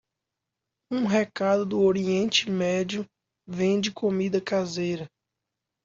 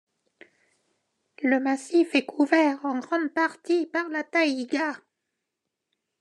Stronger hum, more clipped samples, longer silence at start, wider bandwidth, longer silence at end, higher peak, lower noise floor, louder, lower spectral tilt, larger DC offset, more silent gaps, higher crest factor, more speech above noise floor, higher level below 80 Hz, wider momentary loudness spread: neither; neither; second, 0.9 s vs 1.4 s; second, 7.6 kHz vs 11 kHz; second, 0.8 s vs 1.25 s; about the same, -8 dBFS vs -6 dBFS; about the same, -85 dBFS vs -83 dBFS; about the same, -25 LUFS vs -25 LUFS; first, -5 dB/octave vs -3 dB/octave; neither; neither; about the same, 18 dB vs 20 dB; about the same, 61 dB vs 59 dB; first, -66 dBFS vs under -90 dBFS; first, 11 LU vs 7 LU